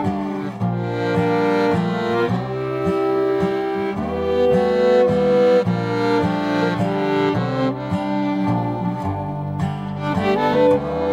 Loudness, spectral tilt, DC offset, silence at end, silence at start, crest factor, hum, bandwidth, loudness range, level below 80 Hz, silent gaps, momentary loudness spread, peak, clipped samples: -20 LUFS; -8 dB/octave; under 0.1%; 0 s; 0 s; 14 dB; none; 10 kHz; 4 LU; -46 dBFS; none; 8 LU; -4 dBFS; under 0.1%